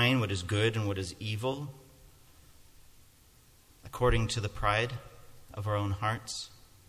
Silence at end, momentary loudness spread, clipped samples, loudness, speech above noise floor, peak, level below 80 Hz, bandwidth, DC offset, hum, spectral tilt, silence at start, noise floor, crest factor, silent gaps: 0.35 s; 15 LU; under 0.1%; -32 LUFS; 29 dB; -12 dBFS; -46 dBFS; 15.5 kHz; under 0.1%; none; -5 dB/octave; 0 s; -60 dBFS; 20 dB; none